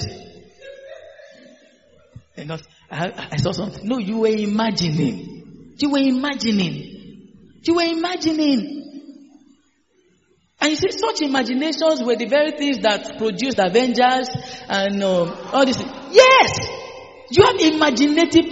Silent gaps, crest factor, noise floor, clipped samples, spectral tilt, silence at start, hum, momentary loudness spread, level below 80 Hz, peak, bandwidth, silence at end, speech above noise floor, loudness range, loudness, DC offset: none; 20 dB; -61 dBFS; under 0.1%; -3.5 dB/octave; 0 s; none; 19 LU; -54 dBFS; 0 dBFS; 8 kHz; 0 s; 44 dB; 9 LU; -18 LUFS; 0.1%